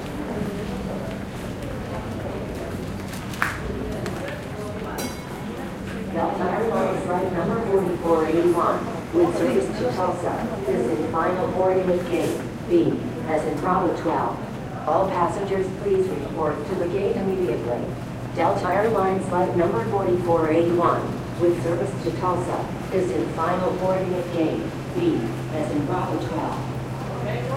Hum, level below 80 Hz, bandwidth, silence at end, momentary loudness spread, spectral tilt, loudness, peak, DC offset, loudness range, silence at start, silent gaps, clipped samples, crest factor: none; -44 dBFS; 16 kHz; 0 s; 10 LU; -7 dB/octave; -24 LUFS; -2 dBFS; under 0.1%; 7 LU; 0 s; none; under 0.1%; 22 dB